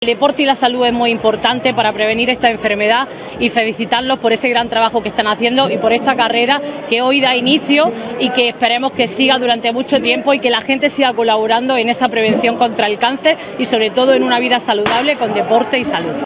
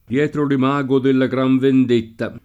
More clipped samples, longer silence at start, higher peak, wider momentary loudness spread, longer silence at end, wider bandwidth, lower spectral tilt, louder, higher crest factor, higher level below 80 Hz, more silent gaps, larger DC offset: neither; about the same, 0 s vs 0.1 s; first, 0 dBFS vs -4 dBFS; about the same, 4 LU vs 5 LU; about the same, 0 s vs 0.05 s; second, 4 kHz vs 7.8 kHz; about the same, -8 dB/octave vs -8 dB/octave; first, -14 LUFS vs -17 LUFS; about the same, 14 dB vs 12 dB; first, -50 dBFS vs -56 dBFS; neither; neither